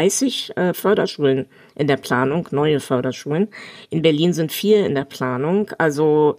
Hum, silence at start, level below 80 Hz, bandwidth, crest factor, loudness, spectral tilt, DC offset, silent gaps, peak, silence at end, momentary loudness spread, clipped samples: none; 0 s; -62 dBFS; 15.5 kHz; 16 dB; -19 LUFS; -5 dB/octave; under 0.1%; none; -2 dBFS; 0 s; 7 LU; under 0.1%